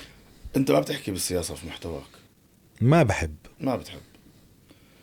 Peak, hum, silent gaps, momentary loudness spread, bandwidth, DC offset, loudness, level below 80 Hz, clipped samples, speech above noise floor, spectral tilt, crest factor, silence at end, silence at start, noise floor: -8 dBFS; none; none; 17 LU; 19 kHz; under 0.1%; -26 LUFS; -50 dBFS; under 0.1%; 33 dB; -5.5 dB/octave; 20 dB; 1.05 s; 0 s; -58 dBFS